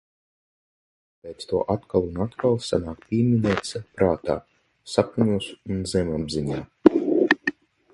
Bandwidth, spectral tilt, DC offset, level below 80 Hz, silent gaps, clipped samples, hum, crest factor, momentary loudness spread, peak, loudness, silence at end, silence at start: 11.5 kHz; -6.5 dB/octave; under 0.1%; -48 dBFS; none; under 0.1%; none; 24 dB; 10 LU; 0 dBFS; -24 LUFS; 0.4 s; 1.25 s